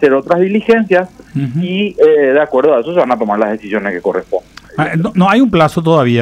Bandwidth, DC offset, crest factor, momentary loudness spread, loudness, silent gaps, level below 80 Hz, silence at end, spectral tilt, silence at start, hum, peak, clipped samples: 12 kHz; under 0.1%; 12 dB; 9 LU; -12 LUFS; none; -46 dBFS; 0 s; -7.5 dB/octave; 0 s; none; 0 dBFS; under 0.1%